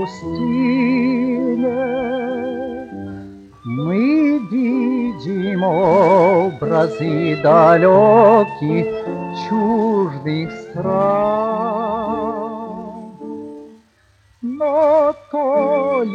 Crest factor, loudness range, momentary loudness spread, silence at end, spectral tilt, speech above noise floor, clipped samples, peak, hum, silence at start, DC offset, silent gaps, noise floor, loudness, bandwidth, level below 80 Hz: 14 dB; 8 LU; 18 LU; 0 s; -8.5 dB/octave; 40 dB; under 0.1%; -2 dBFS; none; 0 s; under 0.1%; none; -55 dBFS; -16 LUFS; 8 kHz; -54 dBFS